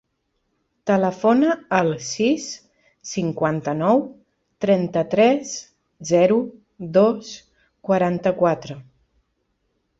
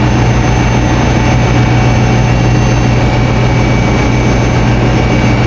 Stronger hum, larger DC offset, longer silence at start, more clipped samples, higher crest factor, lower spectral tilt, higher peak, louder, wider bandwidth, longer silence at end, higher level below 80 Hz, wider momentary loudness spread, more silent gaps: second, none vs 60 Hz at -10 dBFS; neither; first, 0.85 s vs 0 s; second, under 0.1% vs 0.4%; first, 18 dB vs 8 dB; about the same, -5.5 dB/octave vs -6.5 dB/octave; about the same, -2 dBFS vs 0 dBFS; second, -20 LUFS vs -10 LUFS; about the same, 8 kHz vs 7.8 kHz; first, 1.2 s vs 0 s; second, -62 dBFS vs -16 dBFS; first, 19 LU vs 1 LU; neither